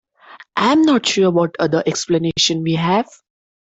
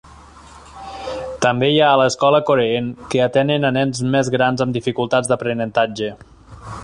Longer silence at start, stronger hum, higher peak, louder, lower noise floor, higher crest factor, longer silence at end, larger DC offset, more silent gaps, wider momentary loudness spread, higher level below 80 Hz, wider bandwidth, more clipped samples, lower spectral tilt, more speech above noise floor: first, 0.3 s vs 0.1 s; neither; about the same, -4 dBFS vs -2 dBFS; about the same, -16 LUFS vs -17 LUFS; about the same, -44 dBFS vs -42 dBFS; about the same, 14 dB vs 16 dB; first, 0.65 s vs 0 s; neither; neither; second, 5 LU vs 13 LU; second, -56 dBFS vs -48 dBFS; second, 8.2 kHz vs 11 kHz; neither; about the same, -4.5 dB/octave vs -5 dB/octave; about the same, 27 dB vs 25 dB